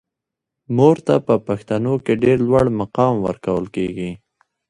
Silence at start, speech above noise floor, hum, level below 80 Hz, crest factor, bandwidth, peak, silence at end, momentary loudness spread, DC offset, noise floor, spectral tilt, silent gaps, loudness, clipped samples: 0.7 s; 66 dB; none; -48 dBFS; 18 dB; 11 kHz; 0 dBFS; 0.55 s; 9 LU; under 0.1%; -83 dBFS; -8.5 dB/octave; none; -18 LUFS; under 0.1%